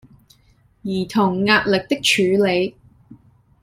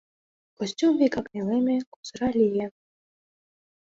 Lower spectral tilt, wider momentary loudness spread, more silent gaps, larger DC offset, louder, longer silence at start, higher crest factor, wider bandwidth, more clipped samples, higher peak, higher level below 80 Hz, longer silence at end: second, -4.5 dB/octave vs -6 dB/octave; about the same, 11 LU vs 12 LU; second, none vs 1.87-2.03 s; neither; first, -18 LUFS vs -25 LUFS; first, 0.85 s vs 0.6 s; about the same, 18 dB vs 16 dB; first, 15.5 kHz vs 7.8 kHz; neither; first, -2 dBFS vs -10 dBFS; first, -54 dBFS vs -60 dBFS; second, 0.45 s vs 1.25 s